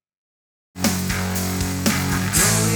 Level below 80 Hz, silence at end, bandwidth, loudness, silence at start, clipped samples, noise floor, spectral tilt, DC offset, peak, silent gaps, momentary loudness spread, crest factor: -38 dBFS; 0 s; over 20 kHz; -20 LUFS; 0.75 s; under 0.1%; under -90 dBFS; -3.5 dB/octave; under 0.1%; -2 dBFS; none; 7 LU; 20 dB